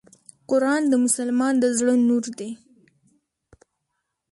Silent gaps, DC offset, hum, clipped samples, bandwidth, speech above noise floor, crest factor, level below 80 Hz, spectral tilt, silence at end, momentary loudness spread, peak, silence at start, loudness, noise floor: none; under 0.1%; none; under 0.1%; 11.5 kHz; 58 dB; 18 dB; -70 dBFS; -3.5 dB/octave; 1.75 s; 15 LU; -6 dBFS; 0.5 s; -21 LUFS; -78 dBFS